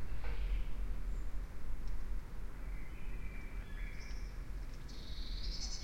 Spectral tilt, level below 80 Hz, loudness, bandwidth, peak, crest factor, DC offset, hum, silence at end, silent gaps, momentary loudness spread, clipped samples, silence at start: -4 dB/octave; -42 dBFS; -47 LUFS; 10 kHz; -26 dBFS; 12 dB; under 0.1%; none; 0 s; none; 7 LU; under 0.1%; 0 s